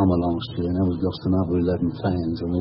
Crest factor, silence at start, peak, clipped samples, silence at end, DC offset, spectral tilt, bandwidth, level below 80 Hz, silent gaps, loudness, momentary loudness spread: 16 dB; 0 s; -8 dBFS; under 0.1%; 0 s; under 0.1%; -12.5 dB/octave; 5.8 kHz; -42 dBFS; none; -24 LUFS; 4 LU